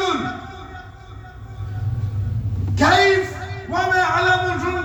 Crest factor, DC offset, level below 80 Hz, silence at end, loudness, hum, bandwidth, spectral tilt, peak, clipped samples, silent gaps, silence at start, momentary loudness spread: 18 dB; under 0.1%; -38 dBFS; 0 s; -19 LUFS; none; 20 kHz; -5 dB/octave; -2 dBFS; under 0.1%; none; 0 s; 23 LU